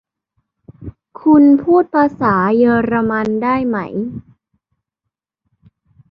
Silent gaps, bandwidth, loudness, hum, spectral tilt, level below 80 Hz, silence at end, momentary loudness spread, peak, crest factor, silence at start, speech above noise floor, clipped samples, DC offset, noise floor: none; 5.6 kHz; -14 LUFS; none; -9.5 dB/octave; -50 dBFS; 1.9 s; 24 LU; -2 dBFS; 14 dB; 0.7 s; 67 dB; under 0.1%; under 0.1%; -80 dBFS